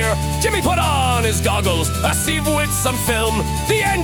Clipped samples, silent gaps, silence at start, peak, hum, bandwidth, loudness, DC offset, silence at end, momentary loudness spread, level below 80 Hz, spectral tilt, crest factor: under 0.1%; none; 0 s; -2 dBFS; none; 18 kHz; -17 LUFS; under 0.1%; 0 s; 2 LU; -30 dBFS; -4 dB/octave; 16 dB